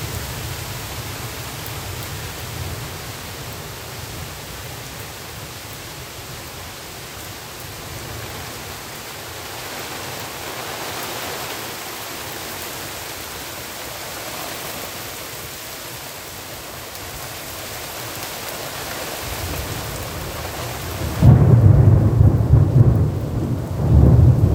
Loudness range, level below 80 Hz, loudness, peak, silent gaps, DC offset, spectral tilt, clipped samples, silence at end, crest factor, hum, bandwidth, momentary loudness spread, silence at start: 16 LU; -32 dBFS; -22 LUFS; 0 dBFS; none; under 0.1%; -5.5 dB/octave; under 0.1%; 0 s; 20 dB; none; 16 kHz; 18 LU; 0 s